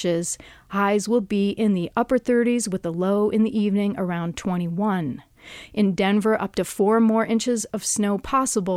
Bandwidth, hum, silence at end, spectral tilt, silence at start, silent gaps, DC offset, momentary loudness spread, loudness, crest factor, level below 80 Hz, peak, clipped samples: 15 kHz; none; 0 s; -5 dB/octave; 0 s; none; under 0.1%; 7 LU; -22 LUFS; 14 dB; -54 dBFS; -8 dBFS; under 0.1%